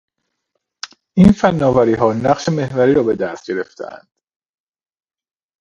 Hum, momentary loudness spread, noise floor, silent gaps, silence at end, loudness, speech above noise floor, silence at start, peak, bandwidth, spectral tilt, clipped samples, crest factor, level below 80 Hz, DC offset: none; 21 LU; -74 dBFS; none; 1.65 s; -15 LUFS; 59 dB; 0.85 s; 0 dBFS; 8 kHz; -7.5 dB/octave; under 0.1%; 18 dB; -42 dBFS; under 0.1%